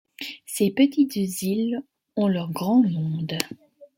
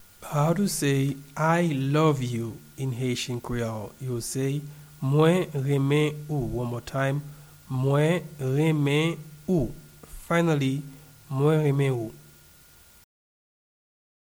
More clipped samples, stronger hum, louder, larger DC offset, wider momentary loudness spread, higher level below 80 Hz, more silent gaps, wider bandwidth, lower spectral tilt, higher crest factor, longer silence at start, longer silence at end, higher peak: neither; neither; about the same, -24 LUFS vs -26 LUFS; neither; about the same, 12 LU vs 11 LU; second, -68 dBFS vs -50 dBFS; neither; second, 17 kHz vs over 20 kHz; about the same, -5.5 dB/octave vs -6.5 dB/octave; about the same, 22 dB vs 18 dB; about the same, 0.2 s vs 0.2 s; second, 0.15 s vs 2.15 s; first, -2 dBFS vs -8 dBFS